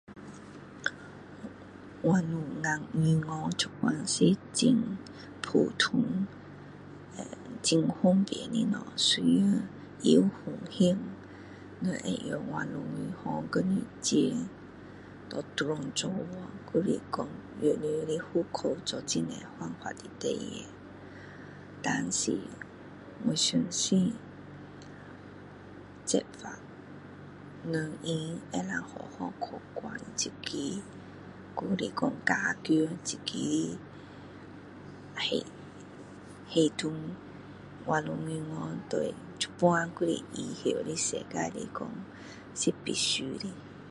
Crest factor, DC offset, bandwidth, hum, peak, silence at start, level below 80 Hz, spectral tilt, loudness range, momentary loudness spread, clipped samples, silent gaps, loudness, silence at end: 22 dB; under 0.1%; 11.5 kHz; none; -10 dBFS; 0.1 s; -64 dBFS; -4.5 dB/octave; 8 LU; 21 LU; under 0.1%; none; -31 LUFS; 0 s